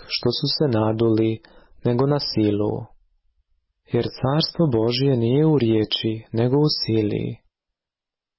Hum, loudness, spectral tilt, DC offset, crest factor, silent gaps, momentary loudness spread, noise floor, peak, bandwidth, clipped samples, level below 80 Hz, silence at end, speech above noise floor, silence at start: none; -21 LUFS; -10 dB/octave; under 0.1%; 12 dB; none; 8 LU; -89 dBFS; -10 dBFS; 5.8 kHz; under 0.1%; -50 dBFS; 1 s; 69 dB; 0 s